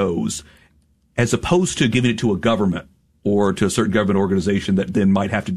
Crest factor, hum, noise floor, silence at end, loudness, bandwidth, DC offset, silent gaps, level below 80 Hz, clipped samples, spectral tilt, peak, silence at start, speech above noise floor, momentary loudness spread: 14 dB; none; -59 dBFS; 0 s; -19 LUFS; 13.5 kHz; 0.4%; none; -44 dBFS; under 0.1%; -5.5 dB/octave; -4 dBFS; 0 s; 40 dB; 7 LU